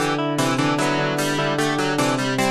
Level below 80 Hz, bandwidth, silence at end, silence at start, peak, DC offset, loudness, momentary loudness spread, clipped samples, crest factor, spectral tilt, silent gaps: -54 dBFS; 13.5 kHz; 0 s; 0 s; -8 dBFS; under 0.1%; -20 LUFS; 1 LU; under 0.1%; 14 dB; -4.5 dB/octave; none